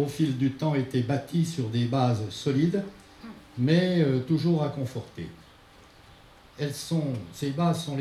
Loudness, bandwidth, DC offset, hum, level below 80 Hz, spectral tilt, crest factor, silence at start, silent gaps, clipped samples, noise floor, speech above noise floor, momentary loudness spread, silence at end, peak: -27 LUFS; 13.5 kHz; under 0.1%; none; -60 dBFS; -7 dB/octave; 18 dB; 0 s; none; under 0.1%; -53 dBFS; 27 dB; 17 LU; 0 s; -10 dBFS